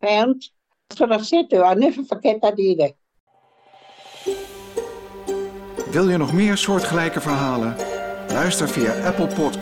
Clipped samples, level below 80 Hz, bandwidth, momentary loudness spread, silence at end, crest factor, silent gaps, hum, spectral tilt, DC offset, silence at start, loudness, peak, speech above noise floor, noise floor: under 0.1%; -52 dBFS; 16.5 kHz; 13 LU; 0 s; 16 dB; 3.20-3.27 s; none; -5 dB/octave; under 0.1%; 0 s; -20 LUFS; -6 dBFS; 35 dB; -53 dBFS